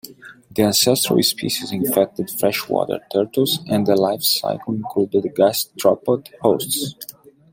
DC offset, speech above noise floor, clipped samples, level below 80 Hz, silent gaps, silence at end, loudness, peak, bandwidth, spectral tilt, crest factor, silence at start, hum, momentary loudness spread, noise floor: under 0.1%; 24 dB; under 0.1%; -60 dBFS; none; 0.4 s; -19 LUFS; -2 dBFS; 16.5 kHz; -4 dB/octave; 18 dB; 0.05 s; none; 8 LU; -43 dBFS